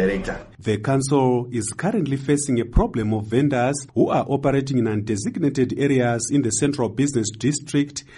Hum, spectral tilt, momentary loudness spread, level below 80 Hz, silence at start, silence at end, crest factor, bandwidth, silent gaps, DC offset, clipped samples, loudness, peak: none; -5.5 dB/octave; 5 LU; -36 dBFS; 0 s; 0 s; 16 dB; 11.5 kHz; none; under 0.1%; under 0.1%; -22 LUFS; -6 dBFS